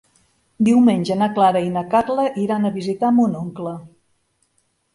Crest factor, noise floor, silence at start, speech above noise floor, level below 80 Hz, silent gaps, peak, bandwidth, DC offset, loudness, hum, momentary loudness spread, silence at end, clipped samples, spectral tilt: 16 dB; -66 dBFS; 0.6 s; 49 dB; -60 dBFS; none; -2 dBFS; 11.5 kHz; under 0.1%; -18 LUFS; none; 13 LU; 1.05 s; under 0.1%; -7 dB/octave